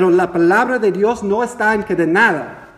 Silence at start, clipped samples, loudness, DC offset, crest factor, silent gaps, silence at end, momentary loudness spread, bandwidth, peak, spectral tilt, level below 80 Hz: 0 s; under 0.1%; -15 LUFS; under 0.1%; 16 dB; none; 0.15 s; 5 LU; 12.5 kHz; 0 dBFS; -6 dB/octave; -50 dBFS